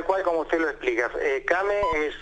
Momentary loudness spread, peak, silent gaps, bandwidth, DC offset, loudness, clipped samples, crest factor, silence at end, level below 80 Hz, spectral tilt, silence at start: 2 LU; -8 dBFS; none; 9.8 kHz; under 0.1%; -25 LUFS; under 0.1%; 18 dB; 0 s; -46 dBFS; -4.5 dB/octave; 0 s